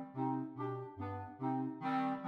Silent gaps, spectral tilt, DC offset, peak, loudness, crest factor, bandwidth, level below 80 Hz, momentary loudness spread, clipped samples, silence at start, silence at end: none; -9 dB/octave; under 0.1%; -26 dBFS; -40 LUFS; 14 dB; 5.6 kHz; -82 dBFS; 7 LU; under 0.1%; 0 s; 0 s